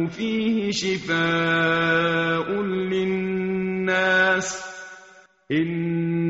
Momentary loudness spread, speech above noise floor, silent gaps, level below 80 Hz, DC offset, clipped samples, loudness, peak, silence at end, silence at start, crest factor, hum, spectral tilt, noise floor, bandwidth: 7 LU; 28 dB; none; -58 dBFS; under 0.1%; under 0.1%; -22 LUFS; -8 dBFS; 0 s; 0 s; 16 dB; none; -3.5 dB/octave; -51 dBFS; 8 kHz